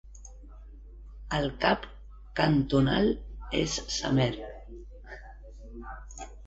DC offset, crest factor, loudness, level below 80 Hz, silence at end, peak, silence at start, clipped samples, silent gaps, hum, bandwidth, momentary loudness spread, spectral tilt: under 0.1%; 22 dB; -28 LUFS; -44 dBFS; 0 s; -8 dBFS; 0.05 s; under 0.1%; none; none; 8.2 kHz; 25 LU; -5 dB/octave